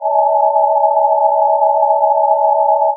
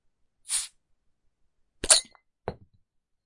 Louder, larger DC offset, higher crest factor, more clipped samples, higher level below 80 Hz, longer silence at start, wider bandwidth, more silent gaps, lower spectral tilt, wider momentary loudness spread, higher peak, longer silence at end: first, -13 LUFS vs -23 LUFS; neither; second, 12 dB vs 30 dB; neither; second, under -90 dBFS vs -54 dBFS; second, 0 s vs 0.5 s; second, 1.1 kHz vs 11.5 kHz; neither; second, 3.5 dB/octave vs 0.5 dB/octave; second, 0 LU vs 21 LU; about the same, -2 dBFS vs -2 dBFS; second, 0 s vs 0.75 s